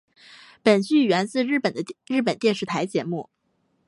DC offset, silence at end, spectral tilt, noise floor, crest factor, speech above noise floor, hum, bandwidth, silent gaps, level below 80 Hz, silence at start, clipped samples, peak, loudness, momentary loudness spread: under 0.1%; 0.65 s; -5.5 dB/octave; -70 dBFS; 18 dB; 48 dB; none; 11.5 kHz; none; -72 dBFS; 0.65 s; under 0.1%; -6 dBFS; -23 LUFS; 9 LU